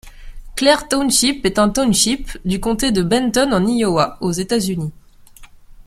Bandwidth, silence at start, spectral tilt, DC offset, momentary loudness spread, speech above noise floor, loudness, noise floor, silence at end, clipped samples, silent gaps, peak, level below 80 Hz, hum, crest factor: 16 kHz; 0.05 s; -4 dB/octave; under 0.1%; 8 LU; 25 dB; -17 LUFS; -41 dBFS; 0.05 s; under 0.1%; none; 0 dBFS; -36 dBFS; none; 18 dB